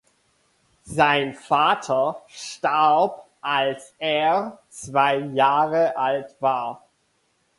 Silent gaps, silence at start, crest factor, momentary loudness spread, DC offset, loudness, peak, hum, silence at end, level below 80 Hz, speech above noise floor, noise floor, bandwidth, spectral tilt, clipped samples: none; 0.85 s; 18 dB; 12 LU; under 0.1%; -22 LUFS; -4 dBFS; none; 0.8 s; -62 dBFS; 46 dB; -68 dBFS; 11.5 kHz; -4 dB/octave; under 0.1%